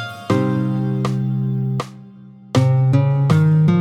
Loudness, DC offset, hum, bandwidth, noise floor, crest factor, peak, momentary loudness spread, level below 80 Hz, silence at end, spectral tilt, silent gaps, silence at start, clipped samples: -18 LUFS; under 0.1%; none; 10 kHz; -41 dBFS; 14 dB; -4 dBFS; 8 LU; -52 dBFS; 0 s; -8 dB/octave; none; 0 s; under 0.1%